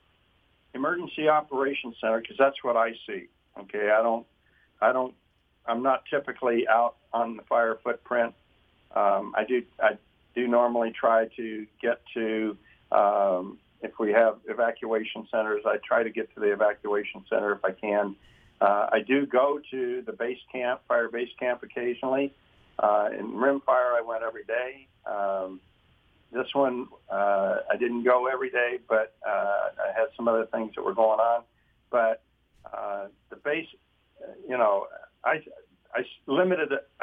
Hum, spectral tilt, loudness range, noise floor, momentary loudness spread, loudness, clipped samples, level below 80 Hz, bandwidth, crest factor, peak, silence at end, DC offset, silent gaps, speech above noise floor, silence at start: none; -7.5 dB/octave; 4 LU; -66 dBFS; 11 LU; -27 LUFS; under 0.1%; -70 dBFS; 3.8 kHz; 20 dB; -8 dBFS; 0.2 s; under 0.1%; none; 40 dB; 0.75 s